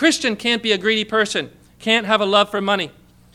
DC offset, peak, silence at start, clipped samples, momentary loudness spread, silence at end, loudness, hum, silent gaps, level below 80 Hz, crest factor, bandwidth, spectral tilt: under 0.1%; -2 dBFS; 0 s; under 0.1%; 10 LU; 0.45 s; -18 LUFS; 60 Hz at -50 dBFS; none; -58 dBFS; 18 dB; 14.5 kHz; -3 dB/octave